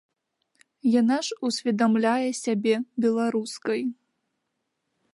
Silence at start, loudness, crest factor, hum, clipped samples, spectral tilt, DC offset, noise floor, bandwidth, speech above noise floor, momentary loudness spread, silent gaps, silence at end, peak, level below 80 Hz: 0.85 s; -25 LUFS; 16 dB; none; under 0.1%; -4.5 dB/octave; under 0.1%; -79 dBFS; 11.5 kHz; 55 dB; 7 LU; none; 1.2 s; -10 dBFS; -78 dBFS